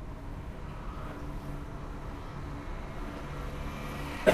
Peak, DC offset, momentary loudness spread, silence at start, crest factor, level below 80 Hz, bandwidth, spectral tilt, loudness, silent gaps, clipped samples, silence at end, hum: -6 dBFS; under 0.1%; 4 LU; 0 s; 30 dB; -42 dBFS; 15.5 kHz; -6 dB/octave; -40 LUFS; none; under 0.1%; 0 s; none